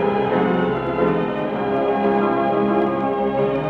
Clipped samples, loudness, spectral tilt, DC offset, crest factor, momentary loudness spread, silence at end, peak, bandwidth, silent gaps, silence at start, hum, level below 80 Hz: under 0.1%; -20 LUFS; -9 dB/octave; under 0.1%; 12 dB; 3 LU; 0 s; -6 dBFS; 5.2 kHz; none; 0 s; none; -48 dBFS